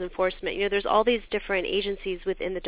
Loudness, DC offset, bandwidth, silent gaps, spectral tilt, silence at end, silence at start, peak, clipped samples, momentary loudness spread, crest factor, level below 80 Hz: -26 LUFS; under 0.1%; 4 kHz; none; -8 dB/octave; 0 s; 0 s; -8 dBFS; under 0.1%; 8 LU; 18 dB; -48 dBFS